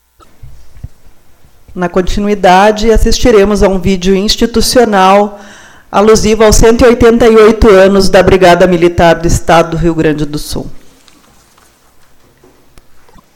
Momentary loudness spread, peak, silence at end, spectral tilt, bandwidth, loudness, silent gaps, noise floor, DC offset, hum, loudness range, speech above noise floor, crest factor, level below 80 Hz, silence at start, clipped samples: 10 LU; 0 dBFS; 2.55 s; -5 dB/octave; 17.5 kHz; -7 LUFS; none; -45 dBFS; under 0.1%; none; 9 LU; 38 dB; 8 dB; -20 dBFS; 0.45 s; 1%